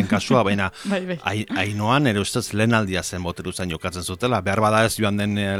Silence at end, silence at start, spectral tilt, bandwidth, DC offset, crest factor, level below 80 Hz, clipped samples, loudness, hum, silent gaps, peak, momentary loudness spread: 0 s; 0 s; -5 dB/octave; 16 kHz; under 0.1%; 18 dB; -50 dBFS; under 0.1%; -22 LUFS; none; none; -2 dBFS; 9 LU